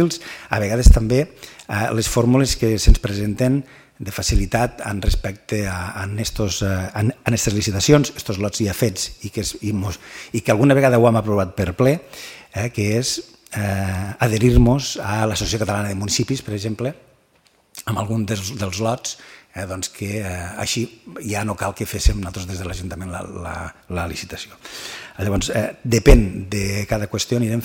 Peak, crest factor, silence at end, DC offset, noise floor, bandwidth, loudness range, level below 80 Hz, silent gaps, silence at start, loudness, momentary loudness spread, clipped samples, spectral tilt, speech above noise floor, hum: 0 dBFS; 20 dB; 0 s; under 0.1%; -58 dBFS; 17 kHz; 7 LU; -26 dBFS; none; 0 s; -20 LUFS; 15 LU; under 0.1%; -5 dB/octave; 39 dB; none